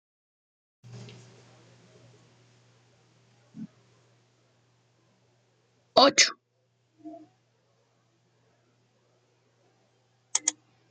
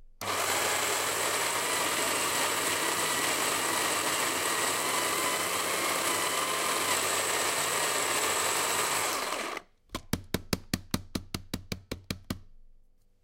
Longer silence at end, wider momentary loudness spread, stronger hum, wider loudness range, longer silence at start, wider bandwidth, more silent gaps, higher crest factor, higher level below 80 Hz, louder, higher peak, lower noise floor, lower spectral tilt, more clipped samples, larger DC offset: second, 0.4 s vs 0.55 s; first, 30 LU vs 12 LU; neither; about the same, 10 LU vs 8 LU; first, 0.95 s vs 0 s; second, 9 kHz vs 16 kHz; neither; first, 28 dB vs 20 dB; second, -82 dBFS vs -54 dBFS; first, -23 LUFS vs -28 LUFS; first, -6 dBFS vs -10 dBFS; first, -72 dBFS vs -59 dBFS; about the same, -1 dB/octave vs -1.5 dB/octave; neither; neither